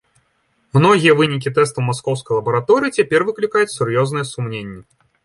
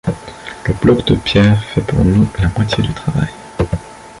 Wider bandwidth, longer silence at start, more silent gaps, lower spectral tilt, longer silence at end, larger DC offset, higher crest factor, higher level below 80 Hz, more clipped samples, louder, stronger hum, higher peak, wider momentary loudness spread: about the same, 11.5 kHz vs 11.5 kHz; first, 0.75 s vs 0.05 s; neither; second, -5.5 dB/octave vs -7 dB/octave; first, 0.4 s vs 0 s; neither; about the same, 16 dB vs 14 dB; second, -56 dBFS vs -28 dBFS; neither; about the same, -17 LUFS vs -15 LUFS; neither; about the same, -2 dBFS vs -2 dBFS; about the same, 12 LU vs 12 LU